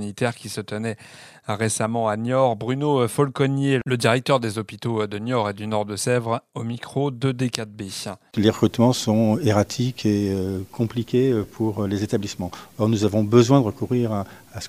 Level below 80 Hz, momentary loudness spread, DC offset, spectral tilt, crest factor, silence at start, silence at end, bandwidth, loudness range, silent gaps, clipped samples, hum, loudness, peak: -60 dBFS; 11 LU; under 0.1%; -6 dB/octave; 22 dB; 0 s; 0 s; 16 kHz; 4 LU; none; under 0.1%; none; -22 LUFS; 0 dBFS